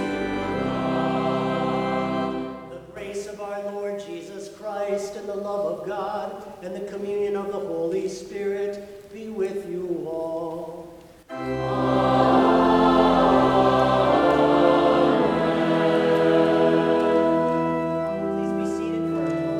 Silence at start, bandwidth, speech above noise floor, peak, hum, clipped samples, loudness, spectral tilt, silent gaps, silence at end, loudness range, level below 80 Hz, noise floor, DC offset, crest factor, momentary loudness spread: 0 s; 14 kHz; 16 dB; -6 dBFS; none; under 0.1%; -22 LUFS; -6.5 dB/octave; none; 0 s; 12 LU; -50 dBFS; -44 dBFS; under 0.1%; 18 dB; 16 LU